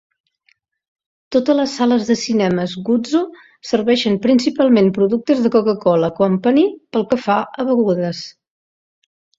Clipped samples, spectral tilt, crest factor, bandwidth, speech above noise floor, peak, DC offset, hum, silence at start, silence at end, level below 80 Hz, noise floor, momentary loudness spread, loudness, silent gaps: under 0.1%; -6 dB/octave; 16 dB; 7.8 kHz; 46 dB; -2 dBFS; under 0.1%; none; 1.3 s; 1.1 s; -58 dBFS; -62 dBFS; 6 LU; -16 LUFS; none